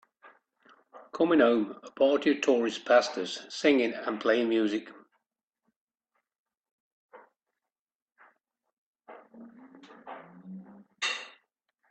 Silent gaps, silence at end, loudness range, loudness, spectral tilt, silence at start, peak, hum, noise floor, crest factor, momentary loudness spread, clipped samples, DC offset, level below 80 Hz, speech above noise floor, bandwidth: 5.43-5.48 s, 5.76-5.87 s, 6.39-6.46 s, 6.57-6.61 s, 6.71-7.09 s, 7.79-7.87 s, 7.95-8.06 s, 8.73-8.94 s; 0.6 s; 14 LU; -27 LUFS; -4 dB/octave; 0.95 s; -10 dBFS; none; under -90 dBFS; 22 dB; 23 LU; under 0.1%; under 0.1%; -78 dBFS; over 64 dB; 8.8 kHz